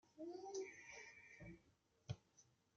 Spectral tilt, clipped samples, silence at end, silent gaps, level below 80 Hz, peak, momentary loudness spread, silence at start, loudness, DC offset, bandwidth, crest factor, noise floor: -5 dB/octave; under 0.1%; 0.25 s; none; -78 dBFS; -36 dBFS; 11 LU; 0.05 s; -55 LUFS; under 0.1%; 8 kHz; 20 dB; -79 dBFS